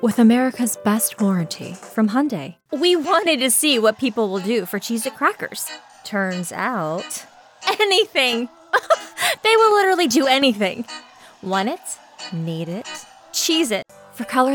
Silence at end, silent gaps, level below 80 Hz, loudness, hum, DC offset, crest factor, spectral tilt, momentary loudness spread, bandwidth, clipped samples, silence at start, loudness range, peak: 0 s; none; -72 dBFS; -19 LUFS; none; under 0.1%; 16 dB; -3.5 dB/octave; 15 LU; 19 kHz; under 0.1%; 0 s; 7 LU; -4 dBFS